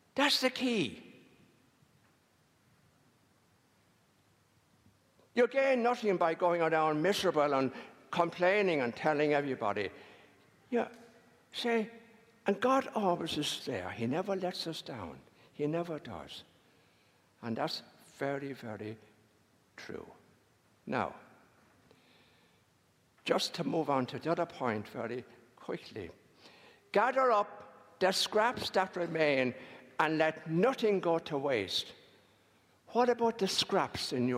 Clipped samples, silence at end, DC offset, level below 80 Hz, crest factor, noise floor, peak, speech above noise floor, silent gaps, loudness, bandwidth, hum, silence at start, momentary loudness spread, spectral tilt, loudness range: under 0.1%; 0 s; under 0.1%; -76 dBFS; 22 dB; -70 dBFS; -12 dBFS; 38 dB; none; -32 LUFS; 16 kHz; none; 0.15 s; 17 LU; -4.5 dB/octave; 11 LU